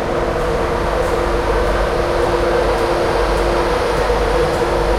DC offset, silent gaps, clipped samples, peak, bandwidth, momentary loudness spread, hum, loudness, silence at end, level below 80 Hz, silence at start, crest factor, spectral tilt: under 0.1%; none; under 0.1%; -4 dBFS; 15.5 kHz; 2 LU; none; -17 LUFS; 0 s; -24 dBFS; 0 s; 12 dB; -5.5 dB/octave